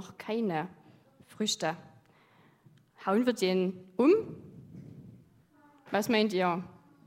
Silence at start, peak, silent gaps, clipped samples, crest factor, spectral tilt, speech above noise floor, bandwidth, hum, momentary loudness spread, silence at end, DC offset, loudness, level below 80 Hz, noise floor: 0 s; -12 dBFS; none; under 0.1%; 20 dB; -5 dB/octave; 33 dB; 16 kHz; none; 23 LU; 0.4 s; under 0.1%; -30 LUFS; -76 dBFS; -63 dBFS